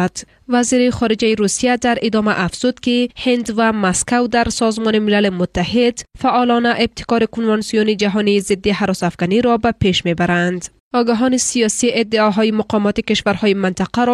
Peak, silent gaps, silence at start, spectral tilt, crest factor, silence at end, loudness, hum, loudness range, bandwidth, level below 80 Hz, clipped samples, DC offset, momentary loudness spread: -4 dBFS; 10.80-10.91 s; 0 s; -4.5 dB/octave; 12 dB; 0 s; -16 LUFS; none; 1 LU; 13 kHz; -42 dBFS; under 0.1%; under 0.1%; 4 LU